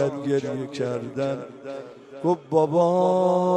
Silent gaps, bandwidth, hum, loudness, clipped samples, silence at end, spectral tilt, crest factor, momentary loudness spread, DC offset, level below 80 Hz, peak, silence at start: none; 9.4 kHz; none; -24 LUFS; under 0.1%; 0 s; -7.5 dB/octave; 16 dB; 17 LU; under 0.1%; -70 dBFS; -6 dBFS; 0 s